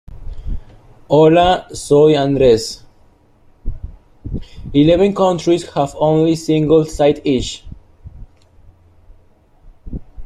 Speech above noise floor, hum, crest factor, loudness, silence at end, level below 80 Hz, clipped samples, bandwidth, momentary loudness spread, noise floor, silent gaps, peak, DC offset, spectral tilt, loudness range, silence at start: 37 dB; none; 16 dB; -14 LUFS; 0 s; -34 dBFS; under 0.1%; 13 kHz; 22 LU; -50 dBFS; none; 0 dBFS; under 0.1%; -6.5 dB/octave; 4 LU; 0.1 s